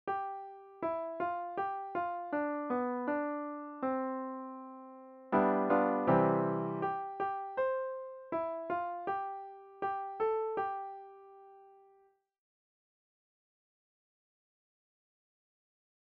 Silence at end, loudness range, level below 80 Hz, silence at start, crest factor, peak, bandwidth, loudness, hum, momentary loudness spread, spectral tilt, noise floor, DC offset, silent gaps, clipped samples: 4.25 s; 8 LU; -74 dBFS; 0.05 s; 20 dB; -16 dBFS; 5.4 kHz; -35 LUFS; none; 17 LU; -7 dB/octave; -69 dBFS; under 0.1%; none; under 0.1%